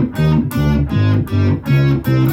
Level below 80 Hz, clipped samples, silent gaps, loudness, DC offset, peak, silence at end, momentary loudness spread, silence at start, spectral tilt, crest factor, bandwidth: -30 dBFS; under 0.1%; none; -15 LUFS; under 0.1%; -4 dBFS; 0 s; 2 LU; 0 s; -8 dB/octave; 10 dB; 16 kHz